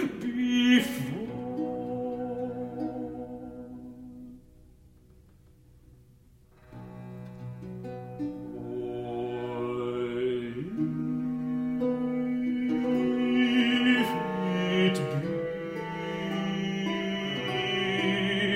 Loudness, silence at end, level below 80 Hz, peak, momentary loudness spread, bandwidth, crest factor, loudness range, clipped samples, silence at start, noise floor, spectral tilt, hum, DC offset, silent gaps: -29 LUFS; 0 s; -60 dBFS; -10 dBFS; 18 LU; 16 kHz; 20 dB; 19 LU; under 0.1%; 0 s; -58 dBFS; -6 dB/octave; none; under 0.1%; none